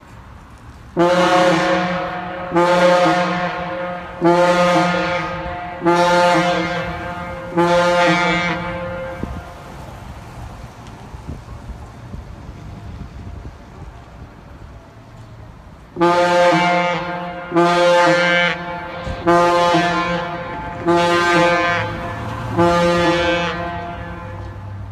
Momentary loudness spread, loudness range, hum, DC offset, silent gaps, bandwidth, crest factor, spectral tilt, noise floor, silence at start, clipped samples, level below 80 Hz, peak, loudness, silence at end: 21 LU; 19 LU; none; under 0.1%; none; 13.5 kHz; 18 dB; -5 dB/octave; -39 dBFS; 0.05 s; under 0.1%; -40 dBFS; 0 dBFS; -17 LUFS; 0 s